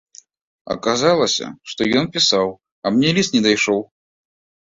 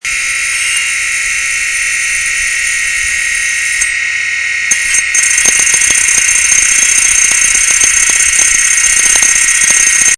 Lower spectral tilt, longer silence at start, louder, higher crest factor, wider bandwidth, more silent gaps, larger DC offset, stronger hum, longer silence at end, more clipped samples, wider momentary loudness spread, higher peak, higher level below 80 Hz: first, -3.5 dB/octave vs 2.5 dB/octave; first, 0.65 s vs 0.05 s; second, -17 LUFS vs -7 LUFS; first, 18 dB vs 10 dB; second, 7.8 kHz vs 11 kHz; first, 2.72-2.82 s vs none; neither; neither; first, 0.85 s vs 0 s; second, under 0.1% vs 0.4%; first, 9 LU vs 6 LU; about the same, -2 dBFS vs 0 dBFS; second, -56 dBFS vs -38 dBFS